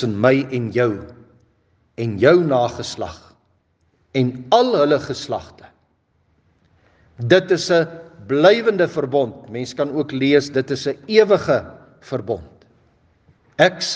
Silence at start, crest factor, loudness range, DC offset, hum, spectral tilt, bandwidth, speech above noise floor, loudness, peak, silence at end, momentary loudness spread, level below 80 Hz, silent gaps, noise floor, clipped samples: 0 s; 20 dB; 3 LU; under 0.1%; none; -5.5 dB/octave; 9.4 kHz; 46 dB; -18 LUFS; 0 dBFS; 0 s; 14 LU; -58 dBFS; none; -63 dBFS; under 0.1%